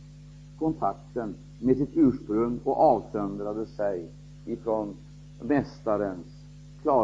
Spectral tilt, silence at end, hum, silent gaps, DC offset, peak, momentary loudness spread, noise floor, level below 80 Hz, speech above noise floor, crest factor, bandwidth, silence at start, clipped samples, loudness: -9 dB/octave; 0 s; 50 Hz at -45 dBFS; none; under 0.1%; -10 dBFS; 23 LU; -47 dBFS; -52 dBFS; 20 dB; 18 dB; 7.8 kHz; 0 s; under 0.1%; -28 LUFS